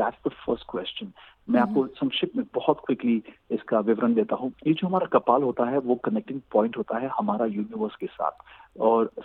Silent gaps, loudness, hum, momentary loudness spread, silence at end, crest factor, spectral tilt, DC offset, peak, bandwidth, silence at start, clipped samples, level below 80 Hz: none; -26 LUFS; none; 9 LU; 0 s; 20 dB; -9.5 dB/octave; under 0.1%; -6 dBFS; 4.4 kHz; 0 s; under 0.1%; -64 dBFS